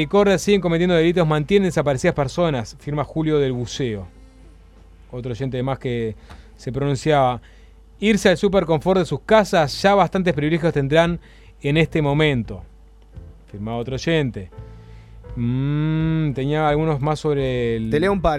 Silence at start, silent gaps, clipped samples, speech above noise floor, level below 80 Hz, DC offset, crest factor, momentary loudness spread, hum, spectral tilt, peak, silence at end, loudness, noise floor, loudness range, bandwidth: 0 s; none; under 0.1%; 27 dB; -40 dBFS; under 0.1%; 18 dB; 14 LU; none; -6.5 dB/octave; -2 dBFS; 0 s; -20 LUFS; -46 dBFS; 8 LU; 13.5 kHz